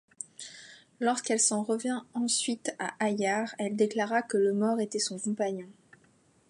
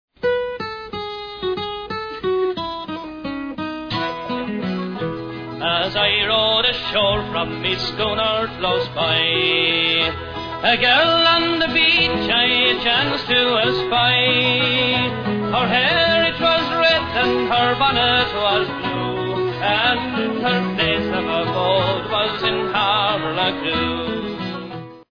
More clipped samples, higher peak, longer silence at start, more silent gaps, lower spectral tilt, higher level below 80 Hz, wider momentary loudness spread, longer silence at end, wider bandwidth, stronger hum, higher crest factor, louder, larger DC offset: neither; second, -12 dBFS vs -4 dBFS; about the same, 0.2 s vs 0.2 s; neither; second, -3 dB/octave vs -6 dB/octave; second, -82 dBFS vs -44 dBFS; about the same, 15 LU vs 13 LU; first, 0.75 s vs 0.1 s; first, 11.5 kHz vs 5.4 kHz; neither; about the same, 20 dB vs 16 dB; second, -29 LUFS vs -18 LUFS; neither